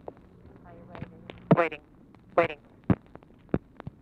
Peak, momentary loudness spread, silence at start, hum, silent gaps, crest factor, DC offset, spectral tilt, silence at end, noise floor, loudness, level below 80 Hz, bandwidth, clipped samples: -8 dBFS; 23 LU; 0.9 s; none; none; 24 dB; under 0.1%; -9.5 dB/octave; 0.45 s; -52 dBFS; -28 LUFS; -52 dBFS; 5.8 kHz; under 0.1%